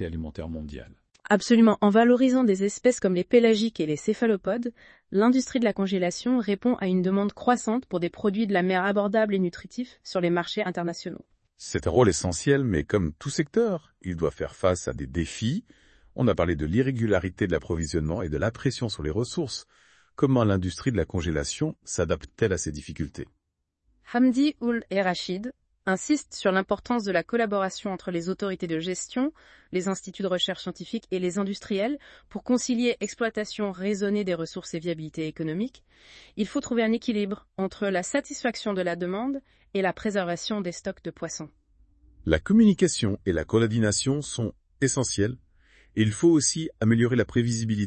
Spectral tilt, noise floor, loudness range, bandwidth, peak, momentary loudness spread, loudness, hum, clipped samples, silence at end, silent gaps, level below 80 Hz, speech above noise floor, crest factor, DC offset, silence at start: -5.5 dB/octave; -79 dBFS; 6 LU; 8.8 kHz; -6 dBFS; 13 LU; -26 LUFS; none; under 0.1%; 0 s; none; -50 dBFS; 53 dB; 20 dB; under 0.1%; 0 s